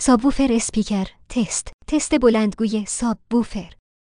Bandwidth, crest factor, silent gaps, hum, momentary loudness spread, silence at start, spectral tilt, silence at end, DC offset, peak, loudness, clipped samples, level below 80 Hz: 10.5 kHz; 16 dB; 1.74-1.79 s; none; 9 LU; 0 s; -4.5 dB/octave; 0.45 s; under 0.1%; -4 dBFS; -21 LUFS; under 0.1%; -38 dBFS